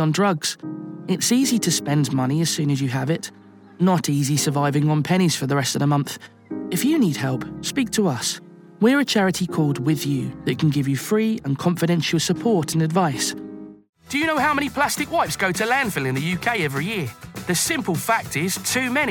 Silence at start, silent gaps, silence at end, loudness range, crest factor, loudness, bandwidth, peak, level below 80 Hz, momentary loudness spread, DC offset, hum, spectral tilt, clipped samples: 0 s; 13.89-13.93 s; 0 s; 1 LU; 16 dB; -21 LUFS; 19 kHz; -6 dBFS; -56 dBFS; 8 LU; under 0.1%; none; -4.5 dB/octave; under 0.1%